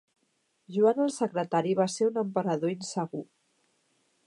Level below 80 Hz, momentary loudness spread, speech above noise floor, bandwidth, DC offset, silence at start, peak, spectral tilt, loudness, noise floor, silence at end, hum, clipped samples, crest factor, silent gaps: -82 dBFS; 10 LU; 46 dB; 11.5 kHz; under 0.1%; 0.7 s; -12 dBFS; -6 dB/octave; -28 LUFS; -74 dBFS; 1.05 s; none; under 0.1%; 18 dB; none